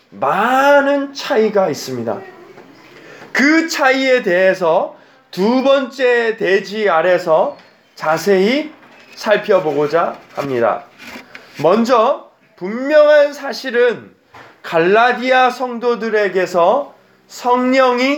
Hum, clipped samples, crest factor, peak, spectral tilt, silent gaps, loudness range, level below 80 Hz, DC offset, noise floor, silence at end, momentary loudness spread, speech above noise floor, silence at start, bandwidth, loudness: none; under 0.1%; 14 dB; 0 dBFS; -4.5 dB/octave; none; 3 LU; -70 dBFS; under 0.1%; -42 dBFS; 0 s; 13 LU; 28 dB; 0.15 s; 19.5 kHz; -15 LUFS